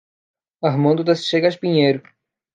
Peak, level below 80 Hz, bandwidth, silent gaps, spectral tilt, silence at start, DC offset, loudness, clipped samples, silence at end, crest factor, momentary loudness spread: -2 dBFS; -70 dBFS; 9.4 kHz; none; -6.5 dB/octave; 0.6 s; under 0.1%; -18 LUFS; under 0.1%; 0.55 s; 16 dB; 6 LU